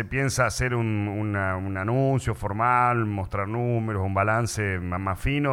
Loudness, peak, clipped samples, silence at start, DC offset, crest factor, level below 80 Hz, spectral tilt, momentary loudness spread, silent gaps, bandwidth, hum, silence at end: -25 LUFS; -8 dBFS; under 0.1%; 0 s; under 0.1%; 16 dB; -42 dBFS; -6 dB/octave; 6 LU; none; 16 kHz; none; 0 s